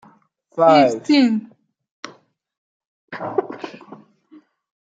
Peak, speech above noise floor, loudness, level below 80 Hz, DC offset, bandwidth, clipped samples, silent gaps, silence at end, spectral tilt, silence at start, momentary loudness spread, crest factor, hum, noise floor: -2 dBFS; 40 dB; -17 LUFS; -74 dBFS; under 0.1%; 8 kHz; under 0.1%; 1.91-2.03 s, 2.58-3.08 s; 0.85 s; -5.5 dB/octave; 0.55 s; 25 LU; 20 dB; none; -56 dBFS